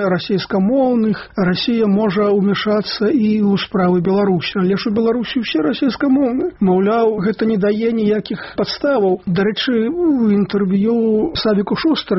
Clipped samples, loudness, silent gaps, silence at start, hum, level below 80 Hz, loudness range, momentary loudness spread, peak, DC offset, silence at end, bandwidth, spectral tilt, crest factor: under 0.1%; -16 LUFS; none; 0 s; none; -48 dBFS; 1 LU; 4 LU; -6 dBFS; under 0.1%; 0 s; 6 kHz; -5.5 dB/octave; 10 dB